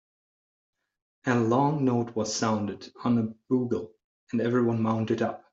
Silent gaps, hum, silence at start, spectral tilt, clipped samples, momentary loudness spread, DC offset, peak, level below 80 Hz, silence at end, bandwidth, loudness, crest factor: 4.04-4.27 s; none; 1.25 s; -6 dB/octave; under 0.1%; 9 LU; under 0.1%; -8 dBFS; -68 dBFS; 0.15 s; 7.8 kHz; -27 LUFS; 20 dB